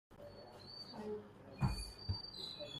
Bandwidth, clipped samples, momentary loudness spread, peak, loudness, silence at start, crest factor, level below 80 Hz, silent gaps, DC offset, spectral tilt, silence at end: 15 kHz; under 0.1%; 15 LU; -24 dBFS; -45 LUFS; 0.1 s; 22 dB; -54 dBFS; none; under 0.1%; -5.5 dB/octave; 0 s